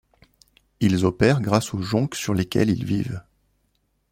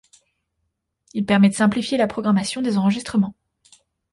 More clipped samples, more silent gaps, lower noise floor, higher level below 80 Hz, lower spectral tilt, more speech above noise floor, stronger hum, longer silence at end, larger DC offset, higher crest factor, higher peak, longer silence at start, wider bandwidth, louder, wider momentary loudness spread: neither; neither; second, -69 dBFS vs -75 dBFS; first, -50 dBFS vs -56 dBFS; about the same, -6 dB/octave vs -6 dB/octave; second, 48 dB vs 56 dB; neither; about the same, 0.9 s vs 0.8 s; neither; about the same, 20 dB vs 16 dB; about the same, -4 dBFS vs -6 dBFS; second, 0.8 s vs 1.15 s; first, 16.5 kHz vs 11.5 kHz; about the same, -22 LUFS vs -20 LUFS; about the same, 7 LU vs 8 LU